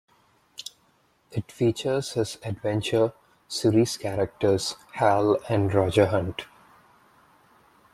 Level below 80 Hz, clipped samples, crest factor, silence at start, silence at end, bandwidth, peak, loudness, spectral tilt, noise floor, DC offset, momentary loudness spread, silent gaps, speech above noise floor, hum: -58 dBFS; under 0.1%; 20 dB; 0.6 s; 1.5 s; 14 kHz; -6 dBFS; -25 LUFS; -5.5 dB/octave; -65 dBFS; under 0.1%; 17 LU; none; 41 dB; none